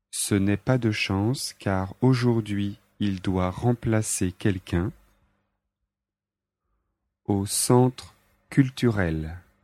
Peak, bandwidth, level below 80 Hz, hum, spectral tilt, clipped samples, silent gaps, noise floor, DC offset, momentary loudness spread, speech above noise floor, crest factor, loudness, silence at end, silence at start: -6 dBFS; 15 kHz; -50 dBFS; none; -5.5 dB/octave; under 0.1%; none; -89 dBFS; under 0.1%; 9 LU; 65 dB; 20 dB; -25 LUFS; 0.25 s; 0.15 s